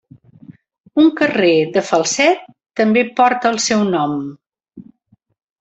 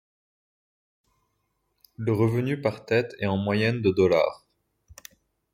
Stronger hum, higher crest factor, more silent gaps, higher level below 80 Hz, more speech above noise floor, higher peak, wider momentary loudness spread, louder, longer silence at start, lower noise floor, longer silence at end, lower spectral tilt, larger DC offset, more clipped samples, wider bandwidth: neither; about the same, 16 dB vs 18 dB; first, 0.80-0.84 s vs none; about the same, -60 dBFS vs -62 dBFS; second, 44 dB vs 51 dB; first, 0 dBFS vs -8 dBFS; about the same, 9 LU vs 7 LU; first, -15 LUFS vs -25 LUFS; second, 0.5 s vs 2 s; second, -58 dBFS vs -75 dBFS; first, 0.8 s vs 0.6 s; second, -4 dB/octave vs -7.5 dB/octave; neither; neither; second, 8.2 kHz vs 16 kHz